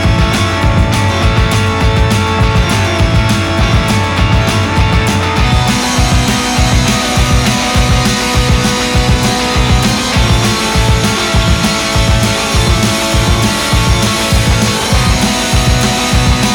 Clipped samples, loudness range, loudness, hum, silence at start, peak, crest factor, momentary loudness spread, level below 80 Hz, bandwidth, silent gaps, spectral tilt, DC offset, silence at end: under 0.1%; 0 LU; -11 LUFS; none; 0 s; 0 dBFS; 10 dB; 1 LU; -16 dBFS; 20 kHz; none; -4.5 dB/octave; under 0.1%; 0 s